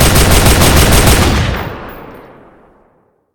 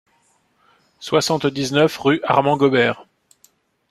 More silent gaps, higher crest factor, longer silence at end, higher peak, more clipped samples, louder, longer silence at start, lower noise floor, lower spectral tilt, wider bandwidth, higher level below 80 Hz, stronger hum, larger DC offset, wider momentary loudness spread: neither; second, 10 dB vs 18 dB; first, 1.15 s vs 0.9 s; about the same, 0 dBFS vs -2 dBFS; first, 0.3% vs under 0.1%; first, -9 LUFS vs -18 LUFS; second, 0 s vs 1 s; second, -54 dBFS vs -62 dBFS; about the same, -4 dB/octave vs -5 dB/octave; first, over 20 kHz vs 14.5 kHz; first, -16 dBFS vs -60 dBFS; neither; neither; first, 17 LU vs 5 LU